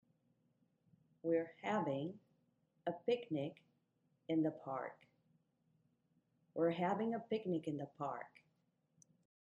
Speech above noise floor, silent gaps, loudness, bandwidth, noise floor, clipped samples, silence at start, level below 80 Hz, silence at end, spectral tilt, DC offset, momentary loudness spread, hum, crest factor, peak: 41 dB; none; -41 LUFS; 7.4 kHz; -81 dBFS; under 0.1%; 1.25 s; -88 dBFS; 1.3 s; -7.5 dB/octave; under 0.1%; 11 LU; none; 18 dB; -24 dBFS